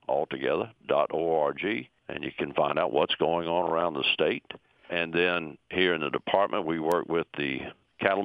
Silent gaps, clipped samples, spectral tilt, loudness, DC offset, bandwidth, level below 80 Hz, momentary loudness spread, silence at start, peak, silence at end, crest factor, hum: none; under 0.1%; -6 dB/octave; -28 LUFS; under 0.1%; 15.5 kHz; -64 dBFS; 9 LU; 0.1 s; -4 dBFS; 0 s; 24 dB; none